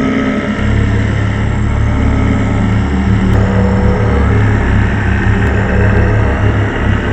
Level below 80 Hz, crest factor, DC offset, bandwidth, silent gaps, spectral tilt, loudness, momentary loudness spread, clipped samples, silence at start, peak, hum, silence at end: -16 dBFS; 10 dB; under 0.1%; 8.4 kHz; none; -8 dB/octave; -12 LUFS; 3 LU; under 0.1%; 0 s; 0 dBFS; none; 0 s